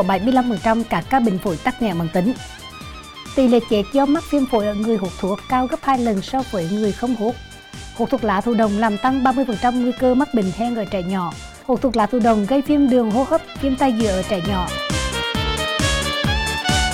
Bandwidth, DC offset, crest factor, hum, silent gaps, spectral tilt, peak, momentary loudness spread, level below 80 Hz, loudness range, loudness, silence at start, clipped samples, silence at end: 16 kHz; under 0.1%; 14 dB; none; none; -5 dB/octave; -4 dBFS; 8 LU; -36 dBFS; 2 LU; -19 LUFS; 0 s; under 0.1%; 0 s